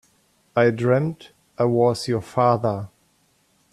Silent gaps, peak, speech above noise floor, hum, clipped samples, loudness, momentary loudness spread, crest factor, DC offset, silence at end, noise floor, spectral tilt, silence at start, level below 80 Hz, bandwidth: none; -6 dBFS; 43 dB; none; under 0.1%; -21 LUFS; 11 LU; 18 dB; under 0.1%; 0.85 s; -63 dBFS; -7 dB/octave; 0.55 s; -60 dBFS; 13 kHz